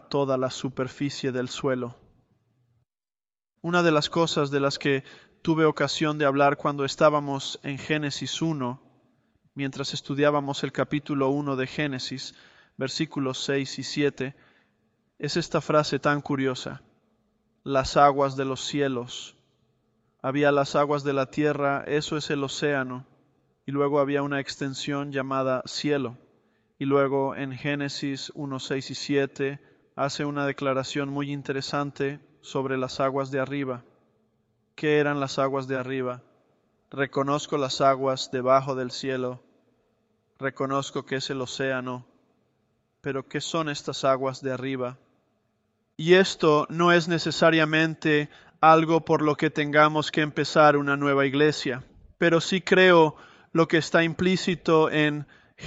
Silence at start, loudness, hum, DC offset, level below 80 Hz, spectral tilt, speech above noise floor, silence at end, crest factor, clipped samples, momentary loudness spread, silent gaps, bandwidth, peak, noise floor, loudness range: 0.1 s; -25 LUFS; none; under 0.1%; -62 dBFS; -5 dB/octave; over 65 dB; 0 s; 22 dB; under 0.1%; 13 LU; none; 8.2 kHz; -4 dBFS; under -90 dBFS; 9 LU